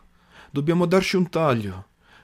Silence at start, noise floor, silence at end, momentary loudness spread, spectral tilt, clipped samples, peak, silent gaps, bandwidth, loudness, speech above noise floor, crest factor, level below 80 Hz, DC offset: 0.55 s; -51 dBFS; 0.4 s; 14 LU; -6.5 dB/octave; under 0.1%; -6 dBFS; none; 15 kHz; -22 LUFS; 30 dB; 18 dB; -54 dBFS; under 0.1%